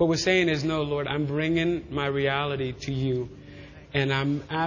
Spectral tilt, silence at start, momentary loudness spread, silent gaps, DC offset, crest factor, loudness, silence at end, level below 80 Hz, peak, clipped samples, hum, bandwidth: -5.5 dB/octave; 0 s; 9 LU; none; under 0.1%; 18 dB; -26 LUFS; 0 s; -50 dBFS; -8 dBFS; under 0.1%; none; 7.4 kHz